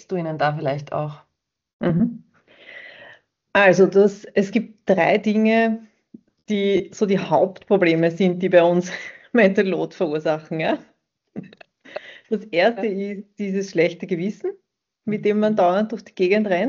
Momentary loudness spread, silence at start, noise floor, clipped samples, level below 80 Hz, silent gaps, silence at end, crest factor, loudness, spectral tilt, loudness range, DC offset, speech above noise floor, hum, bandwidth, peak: 16 LU; 0.1 s; -50 dBFS; under 0.1%; -64 dBFS; 1.73-1.79 s; 0 s; 18 dB; -20 LUFS; -5 dB/octave; 7 LU; under 0.1%; 30 dB; none; 7.4 kHz; -2 dBFS